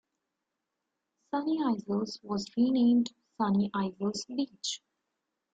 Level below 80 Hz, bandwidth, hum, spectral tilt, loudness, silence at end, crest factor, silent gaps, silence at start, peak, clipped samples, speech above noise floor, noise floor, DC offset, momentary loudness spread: -72 dBFS; 9 kHz; none; -5.5 dB/octave; -31 LUFS; 0.75 s; 14 dB; none; 1.35 s; -18 dBFS; under 0.1%; 56 dB; -85 dBFS; under 0.1%; 11 LU